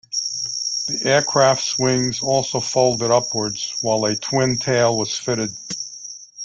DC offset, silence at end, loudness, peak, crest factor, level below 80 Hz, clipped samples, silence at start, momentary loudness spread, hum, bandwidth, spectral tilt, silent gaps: under 0.1%; 0 s; -19 LUFS; -2 dBFS; 18 dB; -56 dBFS; under 0.1%; 0.1 s; 9 LU; none; 11 kHz; -3 dB/octave; none